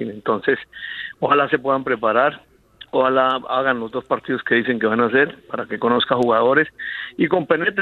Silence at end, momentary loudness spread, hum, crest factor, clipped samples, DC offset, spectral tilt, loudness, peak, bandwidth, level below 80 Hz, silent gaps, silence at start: 0 s; 8 LU; none; 18 dB; under 0.1%; under 0.1%; -7 dB/octave; -19 LUFS; -2 dBFS; 7.6 kHz; -60 dBFS; none; 0 s